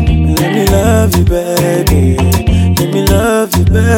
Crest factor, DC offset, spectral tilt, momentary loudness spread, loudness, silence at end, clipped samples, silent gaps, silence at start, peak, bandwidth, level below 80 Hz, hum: 10 dB; under 0.1%; -6 dB/octave; 2 LU; -11 LUFS; 0 s; under 0.1%; none; 0 s; 0 dBFS; 19 kHz; -18 dBFS; none